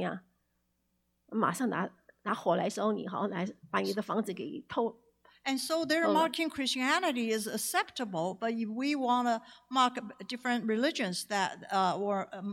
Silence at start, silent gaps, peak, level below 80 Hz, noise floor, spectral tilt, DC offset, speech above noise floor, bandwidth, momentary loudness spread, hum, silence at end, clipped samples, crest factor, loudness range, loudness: 0 s; none; -14 dBFS; -78 dBFS; -77 dBFS; -4 dB/octave; under 0.1%; 46 dB; 16.5 kHz; 8 LU; none; 0 s; under 0.1%; 18 dB; 3 LU; -32 LUFS